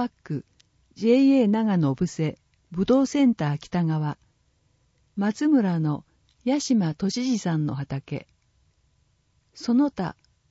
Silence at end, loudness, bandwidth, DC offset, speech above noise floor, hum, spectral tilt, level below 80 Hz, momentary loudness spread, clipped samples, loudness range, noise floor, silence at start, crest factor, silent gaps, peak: 0.4 s; -24 LUFS; 8 kHz; under 0.1%; 44 dB; none; -7 dB/octave; -60 dBFS; 15 LU; under 0.1%; 6 LU; -67 dBFS; 0 s; 16 dB; none; -8 dBFS